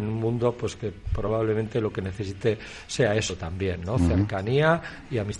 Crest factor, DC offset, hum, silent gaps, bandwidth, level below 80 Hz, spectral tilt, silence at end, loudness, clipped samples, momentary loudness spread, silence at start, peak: 18 dB; under 0.1%; none; none; 11.5 kHz; -42 dBFS; -6 dB/octave; 0 s; -26 LUFS; under 0.1%; 9 LU; 0 s; -8 dBFS